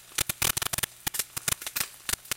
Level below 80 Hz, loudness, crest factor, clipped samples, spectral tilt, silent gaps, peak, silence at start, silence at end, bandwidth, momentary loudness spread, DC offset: -50 dBFS; -29 LUFS; 24 dB; under 0.1%; -0.5 dB/octave; none; -8 dBFS; 0 s; 0 s; 17.5 kHz; 5 LU; under 0.1%